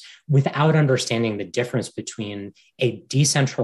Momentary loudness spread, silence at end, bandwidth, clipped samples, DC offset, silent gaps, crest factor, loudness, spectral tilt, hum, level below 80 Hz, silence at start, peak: 13 LU; 0 s; 12 kHz; under 0.1%; under 0.1%; none; 16 dB; -22 LUFS; -5 dB/octave; none; -64 dBFS; 0 s; -6 dBFS